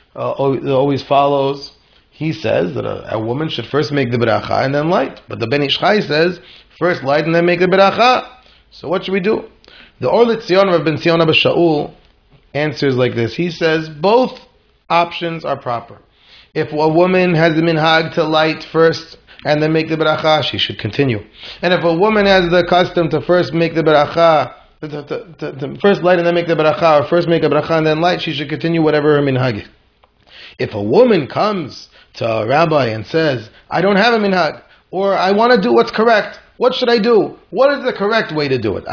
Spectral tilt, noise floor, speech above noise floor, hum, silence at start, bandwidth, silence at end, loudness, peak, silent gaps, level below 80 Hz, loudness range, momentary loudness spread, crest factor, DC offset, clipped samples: -6.5 dB/octave; -54 dBFS; 39 dB; none; 0.15 s; 5.4 kHz; 0 s; -15 LUFS; 0 dBFS; none; -50 dBFS; 4 LU; 12 LU; 14 dB; under 0.1%; under 0.1%